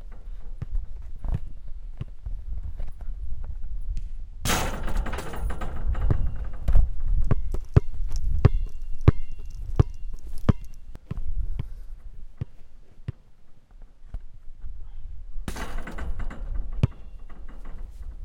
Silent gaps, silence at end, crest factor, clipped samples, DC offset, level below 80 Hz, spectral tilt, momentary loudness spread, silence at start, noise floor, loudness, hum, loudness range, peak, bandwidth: none; 0 s; 22 dB; under 0.1%; under 0.1%; -28 dBFS; -6 dB/octave; 21 LU; 0 s; -44 dBFS; -30 LUFS; none; 15 LU; -2 dBFS; 16.5 kHz